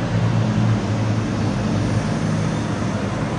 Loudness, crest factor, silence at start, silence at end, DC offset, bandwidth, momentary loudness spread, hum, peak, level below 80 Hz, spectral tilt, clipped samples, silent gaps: -21 LUFS; 12 dB; 0 s; 0 s; under 0.1%; 10.5 kHz; 4 LU; none; -8 dBFS; -38 dBFS; -7 dB/octave; under 0.1%; none